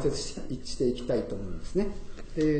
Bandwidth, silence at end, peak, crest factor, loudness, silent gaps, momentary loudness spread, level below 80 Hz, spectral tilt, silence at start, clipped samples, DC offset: 9 kHz; 0 s; -14 dBFS; 16 dB; -32 LUFS; none; 9 LU; -40 dBFS; -6 dB/octave; 0 s; under 0.1%; under 0.1%